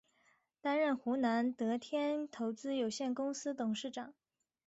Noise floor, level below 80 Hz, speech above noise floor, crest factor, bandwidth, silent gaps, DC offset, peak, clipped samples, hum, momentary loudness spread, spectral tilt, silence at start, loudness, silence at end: -74 dBFS; -82 dBFS; 38 dB; 14 dB; 8 kHz; none; under 0.1%; -24 dBFS; under 0.1%; none; 8 LU; -3.5 dB/octave; 0.65 s; -37 LUFS; 0.55 s